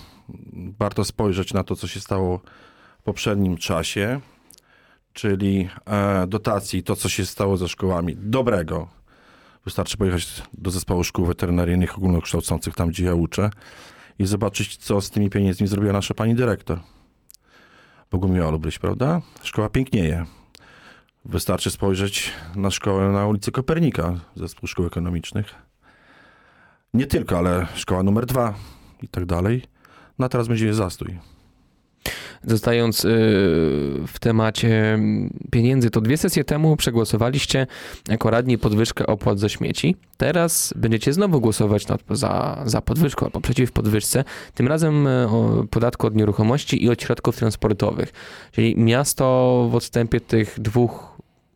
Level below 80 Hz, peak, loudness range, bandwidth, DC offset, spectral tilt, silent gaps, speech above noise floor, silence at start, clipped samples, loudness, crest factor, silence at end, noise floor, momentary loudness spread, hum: -40 dBFS; -4 dBFS; 6 LU; 18 kHz; under 0.1%; -5.5 dB/octave; none; 39 dB; 0 s; under 0.1%; -21 LUFS; 18 dB; 0.45 s; -60 dBFS; 11 LU; none